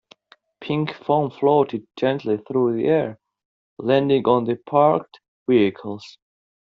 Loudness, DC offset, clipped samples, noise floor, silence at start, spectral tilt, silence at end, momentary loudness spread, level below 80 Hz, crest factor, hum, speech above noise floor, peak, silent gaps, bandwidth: -21 LUFS; under 0.1%; under 0.1%; -53 dBFS; 0.6 s; -5.5 dB/octave; 0.5 s; 13 LU; -64 dBFS; 18 dB; none; 33 dB; -4 dBFS; 3.45-3.77 s, 5.28-5.46 s; 6.8 kHz